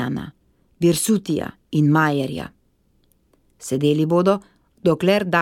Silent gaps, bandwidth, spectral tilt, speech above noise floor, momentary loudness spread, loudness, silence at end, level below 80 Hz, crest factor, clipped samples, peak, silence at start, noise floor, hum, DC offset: none; 17 kHz; -5.5 dB/octave; 43 dB; 13 LU; -20 LUFS; 0 s; -54 dBFS; 18 dB; under 0.1%; -4 dBFS; 0 s; -62 dBFS; none; under 0.1%